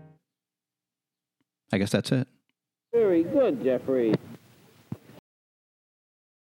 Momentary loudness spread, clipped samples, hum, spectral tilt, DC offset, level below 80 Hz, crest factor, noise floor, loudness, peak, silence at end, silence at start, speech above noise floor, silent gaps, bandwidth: 20 LU; under 0.1%; none; -6.5 dB/octave; under 0.1%; -72 dBFS; 20 dB; -90 dBFS; -26 LUFS; -8 dBFS; 1.6 s; 1.7 s; 66 dB; none; 16.5 kHz